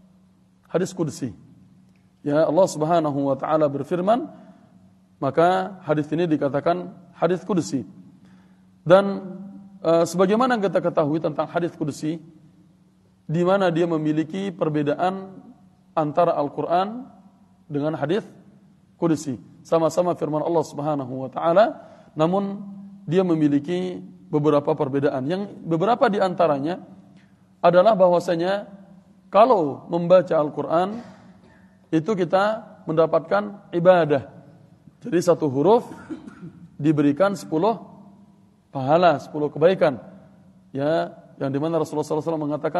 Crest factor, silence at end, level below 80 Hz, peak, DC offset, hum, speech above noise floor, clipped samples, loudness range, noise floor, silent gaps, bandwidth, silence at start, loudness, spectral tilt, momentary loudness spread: 20 dB; 0 s; -68 dBFS; -2 dBFS; under 0.1%; none; 36 dB; under 0.1%; 4 LU; -57 dBFS; none; 12.5 kHz; 0.75 s; -22 LUFS; -7 dB/octave; 15 LU